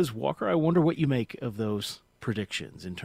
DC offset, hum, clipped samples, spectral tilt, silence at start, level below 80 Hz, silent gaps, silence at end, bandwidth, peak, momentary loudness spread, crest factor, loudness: under 0.1%; none; under 0.1%; -6.5 dB/octave; 0 s; -60 dBFS; none; 0 s; 16 kHz; -12 dBFS; 12 LU; 16 dB; -29 LUFS